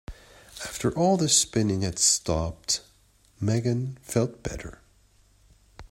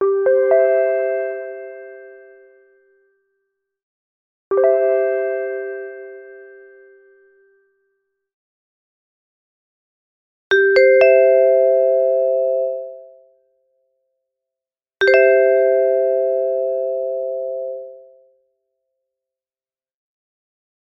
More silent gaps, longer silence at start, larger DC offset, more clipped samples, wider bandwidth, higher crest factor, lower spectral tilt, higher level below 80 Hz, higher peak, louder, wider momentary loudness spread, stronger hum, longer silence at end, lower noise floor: second, none vs 3.83-4.51 s, 8.33-10.50 s; about the same, 0.1 s vs 0 s; neither; neither; first, 16 kHz vs 6 kHz; about the same, 20 dB vs 18 dB; about the same, -4 dB/octave vs -4.5 dB/octave; first, -48 dBFS vs -66 dBFS; second, -8 dBFS vs 0 dBFS; second, -25 LUFS vs -16 LUFS; second, 17 LU vs 20 LU; neither; second, 0.05 s vs 2.85 s; second, -61 dBFS vs under -90 dBFS